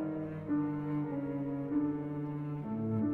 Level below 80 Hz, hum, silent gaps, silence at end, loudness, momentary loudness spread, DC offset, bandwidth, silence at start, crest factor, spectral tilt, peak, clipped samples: -66 dBFS; none; none; 0 s; -36 LUFS; 5 LU; under 0.1%; 3.3 kHz; 0 s; 12 dB; -11.5 dB/octave; -22 dBFS; under 0.1%